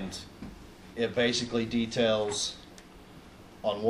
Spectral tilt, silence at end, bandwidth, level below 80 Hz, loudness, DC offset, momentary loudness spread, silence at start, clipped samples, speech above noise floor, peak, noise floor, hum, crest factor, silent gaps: -3.5 dB/octave; 0 s; 13.5 kHz; -56 dBFS; -29 LUFS; under 0.1%; 24 LU; 0 s; under 0.1%; 22 dB; -14 dBFS; -51 dBFS; none; 18 dB; none